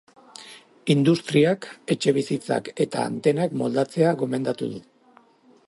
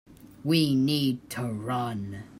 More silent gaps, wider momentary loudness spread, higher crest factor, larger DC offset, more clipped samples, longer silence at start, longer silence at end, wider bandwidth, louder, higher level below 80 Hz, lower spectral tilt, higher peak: neither; first, 16 LU vs 10 LU; about the same, 18 dB vs 18 dB; neither; neither; first, 0.4 s vs 0.1 s; first, 0.9 s vs 0 s; second, 11.5 kHz vs 16 kHz; first, -23 LUFS vs -27 LUFS; second, -68 dBFS vs -62 dBFS; about the same, -6 dB/octave vs -6 dB/octave; first, -6 dBFS vs -10 dBFS